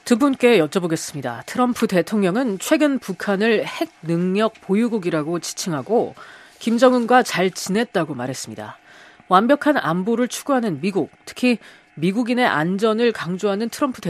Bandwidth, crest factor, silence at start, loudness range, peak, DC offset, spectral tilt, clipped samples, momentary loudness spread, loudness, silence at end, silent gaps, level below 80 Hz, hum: 14.5 kHz; 20 dB; 0.05 s; 2 LU; 0 dBFS; under 0.1%; -5 dB/octave; under 0.1%; 11 LU; -20 LUFS; 0 s; none; -66 dBFS; none